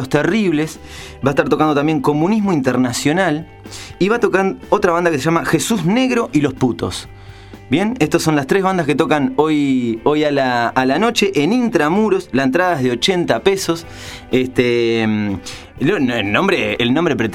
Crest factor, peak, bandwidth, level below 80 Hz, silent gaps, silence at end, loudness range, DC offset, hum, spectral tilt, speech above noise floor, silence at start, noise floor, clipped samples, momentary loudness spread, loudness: 16 dB; 0 dBFS; 16 kHz; -46 dBFS; none; 0 s; 2 LU; under 0.1%; none; -5 dB/octave; 21 dB; 0 s; -36 dBFS; under 0.1%; 7 LU; -16 LUFS